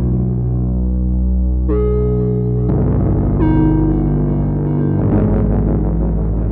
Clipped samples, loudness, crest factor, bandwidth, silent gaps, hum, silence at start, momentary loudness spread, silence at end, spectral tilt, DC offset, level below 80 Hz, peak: under 0.1%; -16 LUFS; 12 dB; 3 kHz; none; none; 0 s; 4 LU; 0 s; -14.5 dB/octave; under 0.1%; -18 dBFS; -2 dBFS